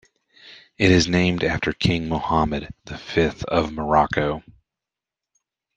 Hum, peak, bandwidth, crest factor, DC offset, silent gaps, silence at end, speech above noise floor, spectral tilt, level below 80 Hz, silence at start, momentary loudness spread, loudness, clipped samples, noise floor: none; -2 dBFS; 9.2 kHz; 20 dB; under 0.1%; none; 1.35 s; 67 dB; -5.5 dB/octave; -42 dBFS; 0.45 s; 10 LU; -21 LUFS; under 0.1%; -88 dBFS